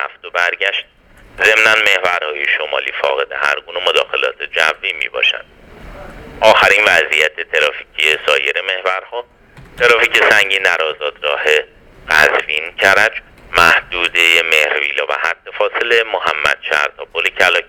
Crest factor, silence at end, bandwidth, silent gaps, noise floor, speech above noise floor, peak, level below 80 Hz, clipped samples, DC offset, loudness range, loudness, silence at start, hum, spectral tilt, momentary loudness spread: 16 dB; 0.05 s; over 20 kHz; none; -34 dBFS; 20 dB; 0 dBFS; -46 dBFS; 0.2%; under 0.1%; 3 LU; -13 LUFS; 0 s; none; -1 dB/octave; 9 LU